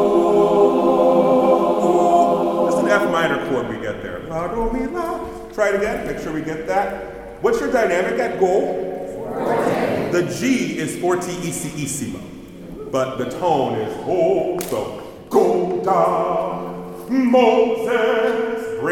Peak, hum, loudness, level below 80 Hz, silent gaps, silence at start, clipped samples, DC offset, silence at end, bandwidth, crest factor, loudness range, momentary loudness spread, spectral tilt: -2 dBFS; none; -19 LUFS; -44 dBFS; none; 0 s; under 0.1%; under 0.1%; 0 s; 17.5 kHz; 16 dB; 7 LU; 13 LU; -5.5 dB/octave